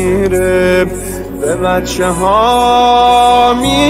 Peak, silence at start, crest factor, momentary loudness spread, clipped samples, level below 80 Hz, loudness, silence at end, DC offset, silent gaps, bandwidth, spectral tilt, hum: 0 dBFS; 0 s; 10 dB; 9 LU; under 0.1%; -28 dBFS; -10 LUFS; 0 s; under 0.1%; none; 16 kHz; -4.5 dB/octave; none